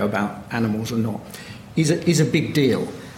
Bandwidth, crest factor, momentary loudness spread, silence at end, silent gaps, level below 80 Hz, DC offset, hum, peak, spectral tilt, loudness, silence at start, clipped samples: 16.5 kHz; 16 dB; 11 LU; 0 s; none; -52 dBFS; under 0.1%; none; -6 dBFS; -5.5 dB/octave; -22 LUFS; 0 s; under 0.1%